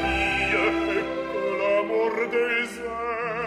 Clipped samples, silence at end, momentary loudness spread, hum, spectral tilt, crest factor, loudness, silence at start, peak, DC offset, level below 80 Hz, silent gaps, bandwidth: under 0.1%; 0 s; 7 LU; none; -5 dB/octave; 14 dB; -24 LUFS; 0 s; -10 dBFS; under 0.1%; -44 dBFS; none; 13.5 kHz